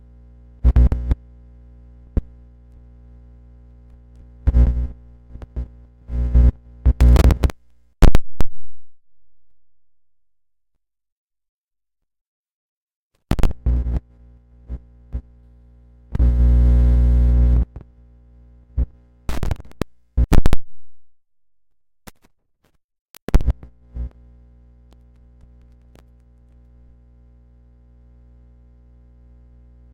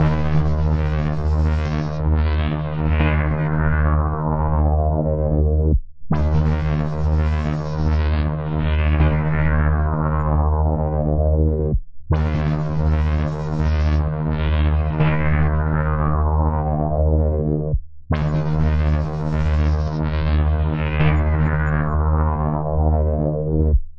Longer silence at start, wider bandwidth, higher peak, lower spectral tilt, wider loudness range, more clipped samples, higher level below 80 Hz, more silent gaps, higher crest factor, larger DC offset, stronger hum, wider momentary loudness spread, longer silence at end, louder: first, 0.65 s vs 0 s; first, 8.4 kHz vs 5.8 kHz; about the same, -2 dBFS vs -4 dBFS; second, -7.5 dB/octave vs -9.5 dB/octave; first, 11 LU vs 1 LU; neither; about the same, -22 dBFS vs -24 dBFS; first, 11.12-11.30 s, 11.49-11.68 s, 12.21-12.88 s, 12.94-13.10 s, 22.84-22.89 s, 22.99-23.14 s, 23.22-23.27 s vs none; about the same, 16 dB vs 14 dB; second, under 0.1% vs 2%; neither; first, 19 LU vs 4 LU; first, 5.85 s vs 0 s; about the same, -20 LUFS vs -20 LUFS